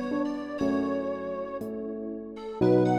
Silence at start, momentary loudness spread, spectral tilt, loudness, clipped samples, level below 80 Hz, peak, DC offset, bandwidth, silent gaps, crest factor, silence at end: 0 s; 12 LU; -8.5 dB/octave; -30 LUFS; under 0.1%; -60 dBFS; -12 dBFS; under 0.1%; 11 kHz; none; 16 dB; 0 s